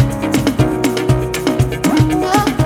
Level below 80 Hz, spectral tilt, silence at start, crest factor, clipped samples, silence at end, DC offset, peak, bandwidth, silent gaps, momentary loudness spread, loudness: -30 dBFS; -6 dB/octave; 0 s; 14 dB; under 0.1%; 0 s; under 0.1%; 0 dBFS; 17 kHz; none; 3 LU; -15 LUFS